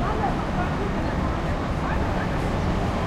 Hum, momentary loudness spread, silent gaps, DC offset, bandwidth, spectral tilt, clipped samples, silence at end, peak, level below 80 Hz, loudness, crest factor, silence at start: none; 1 LU; none; under 0.1%; 13.5 kHz; -7 dB/octave; under 0.1%; 0 s; -12 dBFS; -30 dBFS; -26 LUFS; 12 dB; 0 s